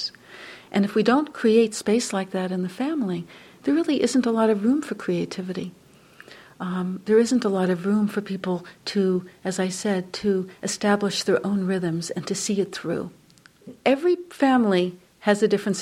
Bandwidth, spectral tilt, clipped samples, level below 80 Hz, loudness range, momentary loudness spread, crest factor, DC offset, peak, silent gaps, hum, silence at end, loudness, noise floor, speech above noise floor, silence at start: 14 kHz; -5 dB/octave; under 0.1%; -66 dBFS; 2 LU; 11 LU; 20 dB; under 0.1%; -4 dBFS; none; none; 0 s; -24 LUFS; -50 dBFS; 27 dB; 0 s